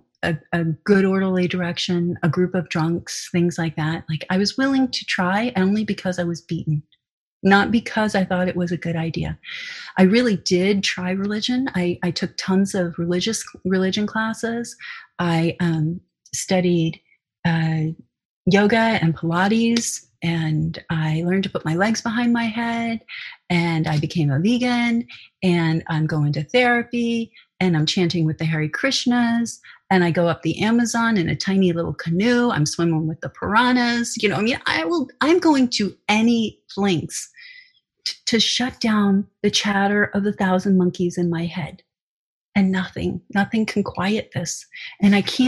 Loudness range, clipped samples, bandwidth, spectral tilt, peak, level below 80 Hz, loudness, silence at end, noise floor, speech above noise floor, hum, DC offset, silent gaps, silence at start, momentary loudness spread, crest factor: 3 LU; under 0.1%; 12.5 kHz; -5 dB/octave; -2 dBFS; -52 dBFS; -21 LUFS; 0 s; -51 dBFS; 31 dB; none; under 0.1%; 7.11-7.40 s, 18.25-18.45 s, 42.02-42.52 s; 0.25 s; 9 LU; 20 dB